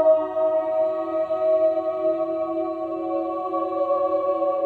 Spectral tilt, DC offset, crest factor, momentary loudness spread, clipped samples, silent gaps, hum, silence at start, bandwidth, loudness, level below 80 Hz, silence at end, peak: -8 dB/octave; under 0.1%; 14 dB; 6 LU; under 0.1%; none; none; 0 s; 4.4 kHz; -23 LUFS; -66 dBFS; 0 s; -8 dBFS